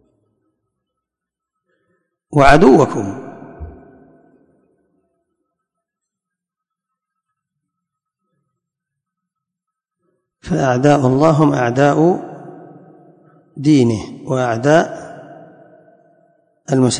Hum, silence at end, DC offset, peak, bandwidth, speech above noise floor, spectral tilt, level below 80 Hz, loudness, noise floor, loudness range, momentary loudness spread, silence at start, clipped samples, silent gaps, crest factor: none; 0 s; under 0.1%; 0 dBFS; 11 kHz; 71 dB; -6.5 dB/octave; -42 dBFS; -14 LUFS; -84 dBFS; 5 LU; 25 LU; 2.3 s; under 0.1%; none; 18 dB